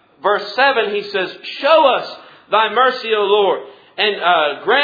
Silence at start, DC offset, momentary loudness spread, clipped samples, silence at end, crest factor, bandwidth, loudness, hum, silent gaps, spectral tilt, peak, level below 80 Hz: 0.25 s; under 0.1%; 9 LU; under 0.1%; 0 s; 16 dB; 5 kHz; -16 LUFS; none; none; -4.5 dB/octave; 0 dBFS; -68 dBFS